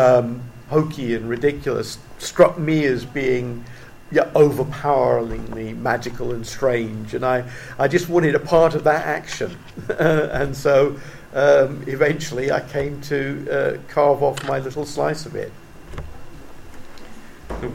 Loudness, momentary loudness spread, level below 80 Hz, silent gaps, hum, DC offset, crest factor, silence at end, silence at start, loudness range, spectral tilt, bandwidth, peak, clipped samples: -20 LUFS; 15 LU; -42 dBFS; none; none; 0.2%; 20 dB; 0 s; 0 s; 4 LU; -6 dB/octave; 16.5 kHz; 0 dBFS; under 0.1%